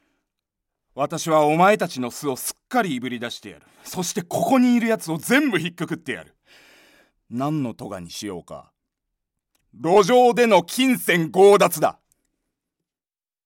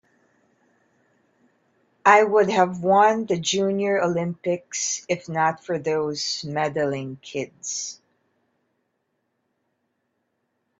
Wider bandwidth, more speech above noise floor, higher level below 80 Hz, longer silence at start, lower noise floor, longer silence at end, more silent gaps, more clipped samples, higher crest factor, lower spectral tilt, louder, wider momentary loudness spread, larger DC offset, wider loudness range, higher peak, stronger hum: first, 17 kHz vs 8 kHz; first, over 70 dB vs 53 dB; about the same, -66 dBFS vs -68 dBFS; second, 0.95 s vs 2.05 s; first, under -90 dBFS vs -75 dBFS; second, 1.55 s vs 2.85 s; neither; neither; second, 18 dB vs 24 dB; about the same, -4.5 dB/octave vs -3.5 dB/octave; about the same, -20 LUFS vs -22 LUFS; first, 17 LU vs 13 LU; neither; about the same, 13 LU vs 15 LU; second, -4 dBFS vs 0 dBFS; neither